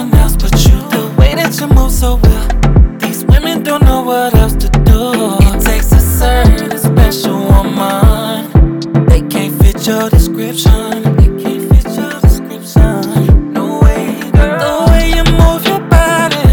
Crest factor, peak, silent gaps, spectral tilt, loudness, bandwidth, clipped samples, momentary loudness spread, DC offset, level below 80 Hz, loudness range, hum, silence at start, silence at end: 8 dB; 0 dBFS; none; -6 dB/octave; -11 LUFS; 20 kHz; 1%; 4 LU; under 0.1%; -12 dBFS; 1 LU; none; 0 s; 0 s